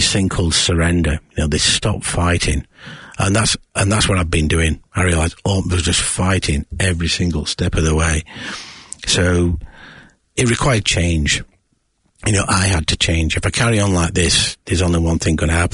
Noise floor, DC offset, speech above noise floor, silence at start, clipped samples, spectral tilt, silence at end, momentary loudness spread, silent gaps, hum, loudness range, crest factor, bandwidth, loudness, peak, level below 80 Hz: -63 dBFS; under 0.1%; 47 dB; 0 s; under 0.1%; -4 dB/octave; 0 s; 7 LU; none; none; 3 LU; 16 dB; 11 kHz; -17 LUFS; -2 dBFS; -30 dBFS